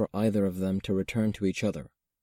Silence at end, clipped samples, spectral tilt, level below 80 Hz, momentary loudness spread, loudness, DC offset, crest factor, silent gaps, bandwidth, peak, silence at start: 0.35 s; under 0.1%; -7 dB/octave; -56 dBFS; 5 LU; -29 LUFS; under 0.1%; 14 dB; none; 16 kHz; -14 dBFS; 0 s